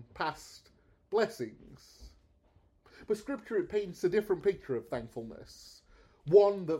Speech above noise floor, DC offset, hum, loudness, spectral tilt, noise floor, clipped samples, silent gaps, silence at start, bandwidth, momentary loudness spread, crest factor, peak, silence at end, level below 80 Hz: 35 dB; under 0.1%; none; -32 LUFS; -6 dB/octave; -67 dBFS; under 0.1%; none; 0 s; 14 kHz; 24 LU; 22 dB; -10 dBFS; 0 s; -62 dBFS